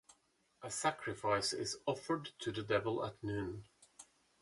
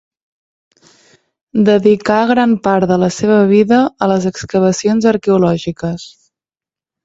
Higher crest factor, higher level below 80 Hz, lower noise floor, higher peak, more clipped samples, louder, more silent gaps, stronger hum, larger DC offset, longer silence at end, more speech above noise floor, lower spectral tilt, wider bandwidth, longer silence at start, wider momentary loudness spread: first, 20 dB vs 14 dB; second, -66 dBFS vs -50 dBFS; second, -75 dBFS vs under -90 dBFS; second, -20 dBFS vs 0 dBFS; neither; second, -39 LUFS vs -13 LUFS; neither; neither; neither; second, 0.4 s vs 0.95 s; second, 36 dB vs over 78 dB; second, -4 dB/octave vs -6.5 dB/octave; first, 11.5 kHz vs 8 kHz; second, 0.1 s vs 1.55 s; first, 17 LU vs 9 LU